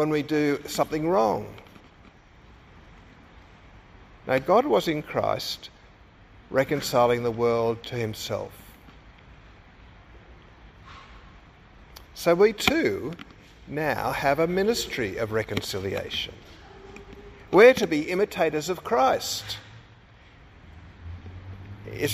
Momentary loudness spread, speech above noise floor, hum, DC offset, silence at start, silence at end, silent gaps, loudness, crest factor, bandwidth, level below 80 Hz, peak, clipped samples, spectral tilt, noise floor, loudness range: 24 LU; 28 dB; none; under 0.1%; 0 s; 0 s; none; -24 LUFS; 24 dB; 15.5 kHz; -52 dBFS; -4 dBFS; under 0.1%; -4.5 dB/octave; -52 dBFS; 9 LU